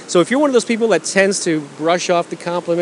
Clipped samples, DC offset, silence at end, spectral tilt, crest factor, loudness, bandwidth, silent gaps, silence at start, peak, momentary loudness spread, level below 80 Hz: under 0.1%; under 0.1%; 0 s; -4 dB/octave; 16 dB; -16 LUFS; 11.5 kHz; none; 0 s; 0 dBFS; 6 LU; -68 dBFS